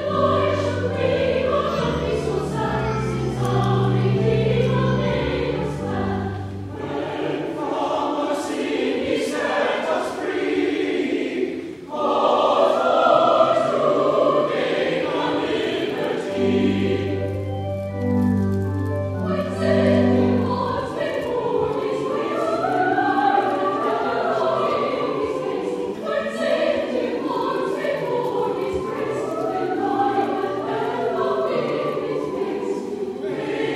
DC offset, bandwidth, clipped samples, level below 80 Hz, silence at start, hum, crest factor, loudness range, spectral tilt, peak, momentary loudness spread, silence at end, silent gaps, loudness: under 0.1%; 13.5 kHz; under 0.1%; -46 dBFS; 0 s; none; 18 dB; 5 LU; -7 dB/octave; -2 dBFS; 8 LU; 0 s; none; -22 LUFS